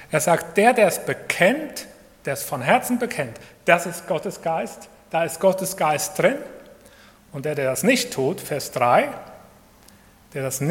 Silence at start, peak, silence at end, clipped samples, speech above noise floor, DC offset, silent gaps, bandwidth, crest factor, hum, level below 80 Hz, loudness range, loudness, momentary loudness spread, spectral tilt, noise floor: 0 s; 0 dBFS; 0 s; under 0.1%; 29 dB; under 0.1%; none; 17.5 kHz; 22 dB; none; -60 dBFS; 3 LU; -22 LUFS; 15 LU; -4 dB/octave; -51 dBFS